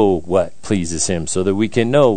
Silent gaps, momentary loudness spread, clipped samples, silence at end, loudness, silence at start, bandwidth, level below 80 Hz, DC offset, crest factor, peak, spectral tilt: none; 5 LU; under 0.1%; 0 s; -18 LUFS; 0 s; 9.4 kHz; -46 dBFS; 4%; 16 dB; 0 dBFS; -5 dB/octave